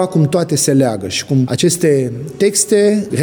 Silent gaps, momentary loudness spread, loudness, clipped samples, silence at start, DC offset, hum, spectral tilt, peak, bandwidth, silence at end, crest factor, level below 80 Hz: none; 5 LU; -14 LUFS; under 0.1%; 0 s; under 0.1%; none; -5 dB/octave; -2 dBFS; over 20 kHz; 0 s; 12 dB; -54 dBFS